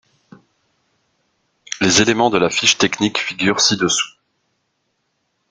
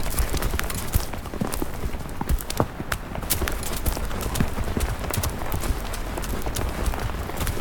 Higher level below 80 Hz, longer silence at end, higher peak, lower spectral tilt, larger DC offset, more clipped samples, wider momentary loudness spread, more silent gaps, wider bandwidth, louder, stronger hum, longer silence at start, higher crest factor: second, -54 dBFS vs -30 dBFS; first, 1.4 s vs 0 s; about the same, 0 dBFS vs -2 dBFS; second, -2.5 dB/octave vs -4.5 dB/octave; neither; neither; about the same, 6 LU vs 5 LU; neither; second, 11 kHz vs 19 kHz; first, -15 LUFS vs -28 LUFS; neither; first, 1.7 s vs 0 s; about the same, 20 dB vs 24 dB